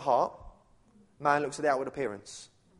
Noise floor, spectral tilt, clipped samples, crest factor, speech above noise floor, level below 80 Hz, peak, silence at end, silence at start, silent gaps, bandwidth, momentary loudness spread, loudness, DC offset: -62 dBFS; -4.5 dB/octave; under 0.1%; 22 dB; 32 dB; -62 dBFS; -10 dBFS; 0.35 s; 0 s; none; 11.5 kHz; 16 LU; -30 LUFS; under 0.1%